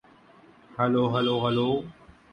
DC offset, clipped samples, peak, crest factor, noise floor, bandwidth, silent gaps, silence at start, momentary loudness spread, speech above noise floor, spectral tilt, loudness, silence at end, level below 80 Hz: under 0.1%; under 0.1%; -10 dBFS; 18 dB; -55 dBFS; 8.8 kHz; none; 0.75 s; 14 LU; 30 dB; -8 dB/octave; -25 LUFS; 0.4 s; -60 dBFS